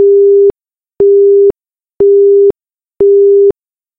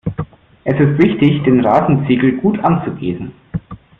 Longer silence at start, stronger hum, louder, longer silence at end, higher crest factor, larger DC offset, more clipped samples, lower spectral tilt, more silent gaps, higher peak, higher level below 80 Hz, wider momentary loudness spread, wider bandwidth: about the same, 0 s vs 0.05 s; neither; first, -8 LUFS vs -14 LUFS; first, 0.5 s vs 0.25 s; second, 6 dB vs 14 dB; neither; neither; first, -12 dB/octave vs -10 dB/octave; neither; about the same, -2 dBFS vs -2 dBFS; about the same, -46 dBFS vs -44 dBFS; second, 6 LU vs 15 LU; second, 1.4 kHz vs 4.3 kHz